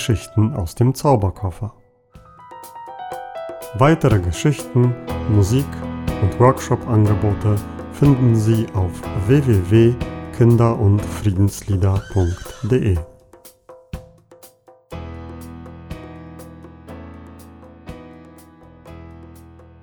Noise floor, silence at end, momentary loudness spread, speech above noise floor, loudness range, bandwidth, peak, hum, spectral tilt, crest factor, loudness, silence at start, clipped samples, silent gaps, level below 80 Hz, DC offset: -48 dBFS; 0.45 s; 23 LU; 31 dB; 20 LU; 19 kHz; -2 dBFS; none; -7.5 dB/octave; 18 dB; -18 LUFS; 0 s; under 0.1%; none; -38 dBFS; under 0.1%